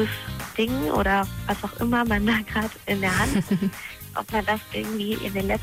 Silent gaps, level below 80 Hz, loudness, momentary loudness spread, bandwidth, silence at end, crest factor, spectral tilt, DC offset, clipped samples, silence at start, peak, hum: none; -40 dBFS; -25 LUFS; 8 LU; 16 kHz; 0 s; 14 dB; -5 dB/octave; under 0.1%; under 0.1%; 0 s; -12 dBFS; none